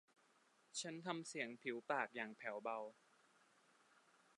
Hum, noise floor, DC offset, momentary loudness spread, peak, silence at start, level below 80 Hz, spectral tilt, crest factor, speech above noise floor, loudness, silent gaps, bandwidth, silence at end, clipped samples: none; -76 dBFS; under 0.1%; 6 LU; -26 dBFS; 0.75 s; under -90 dBFS; -3 dB/octave; 24 dB; 29 dB; -47 LUFS; none; 11 kHz; 1.45 s; under 0.1%